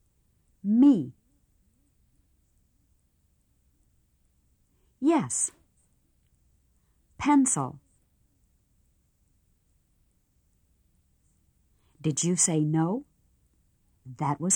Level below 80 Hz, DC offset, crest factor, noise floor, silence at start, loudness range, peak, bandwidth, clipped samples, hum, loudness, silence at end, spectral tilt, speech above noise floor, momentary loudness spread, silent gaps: -66 dBFS; under 0.1%; 20 dB; -69 dBFS; 0.65 s; 6 LU; -12 dBFS; 12.5 kHz; under 0.1%; none; -25 LUFS; 0 s; -5 dB/octave; 45 dB; 14 LU; none